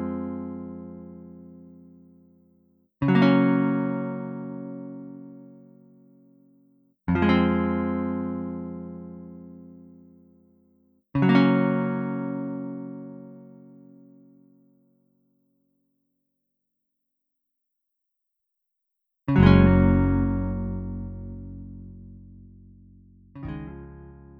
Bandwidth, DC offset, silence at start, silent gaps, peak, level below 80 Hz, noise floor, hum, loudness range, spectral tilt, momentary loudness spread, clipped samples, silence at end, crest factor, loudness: 5.4 kHz; under 0.1%; 0 s; none; -4 dBFS; -42 dBFS; -81 dBFS; none; 15 LU; -10 dB/octave; 26 LU; under 0.1%; 0.15 s; 24 dB; -24 LUFS